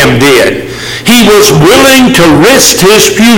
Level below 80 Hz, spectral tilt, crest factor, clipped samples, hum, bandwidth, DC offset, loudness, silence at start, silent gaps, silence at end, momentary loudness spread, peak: -28 dBFS; -3.5 dB/octave; 4 dB; 4%; none; over 20 kHz; under 0.1%; -3 LUFS; 0 s; none; 0 s; 8 LU; 0 dBFS